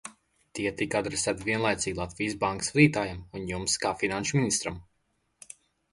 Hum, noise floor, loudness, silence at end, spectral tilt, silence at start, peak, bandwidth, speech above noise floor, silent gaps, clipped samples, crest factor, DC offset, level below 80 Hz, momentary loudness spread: none; -74 dBFS; -28 LUFS; 1.1 s; -4 dB/octave; 0.05 s; -6 dBFS; 11.5 kHz; 46 dB; none; under 0.1%; 22 dB; under 0.1%; -54 dBFS; 20 LU